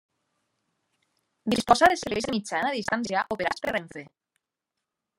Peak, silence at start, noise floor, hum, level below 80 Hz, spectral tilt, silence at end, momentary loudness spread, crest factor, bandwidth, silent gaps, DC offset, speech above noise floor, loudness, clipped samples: -4 dBFS; 1.45 s; -85 dBFS; none; -58 dBFS; -3.5 dB/octave; 1.15 s; 13 LU; 26 dB; 16 kHz; none; under 0.1%; 60 dB; -25 LUFS; under 0.1%